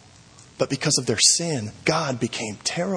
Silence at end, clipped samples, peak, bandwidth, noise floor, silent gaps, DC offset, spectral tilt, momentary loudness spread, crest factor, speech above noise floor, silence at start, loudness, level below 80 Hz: 0 s; under 0.1%; -4 dBFS; 10.5 kHz; -49 dBFS; none; under 0.1%; -2.5 dB/octave; 11 LU; 20 dB; 26 dB; 0.4 s; -22 LUFS; -60 dBFS